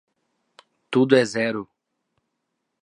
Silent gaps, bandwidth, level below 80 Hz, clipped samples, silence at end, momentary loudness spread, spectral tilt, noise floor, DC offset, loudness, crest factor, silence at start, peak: none; 10.5 kHz; -72 dBFS; under 0.1%; 1.2 s; 9 LU; -5.5 dB/octave; -78 dBFS; under 0.1%; -21 LUFS; 22 dB; 0.9 s; -2 dBFS